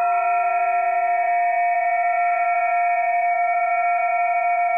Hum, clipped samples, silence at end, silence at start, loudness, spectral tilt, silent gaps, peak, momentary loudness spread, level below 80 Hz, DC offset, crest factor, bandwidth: none; under 0.1%; 0 s; 0 s; -20 LUFS; -3 dB/octave; none; -12 dBFS; 0 LU; -76 dBFS; 0.1%; 8 dB; 3.2 kHz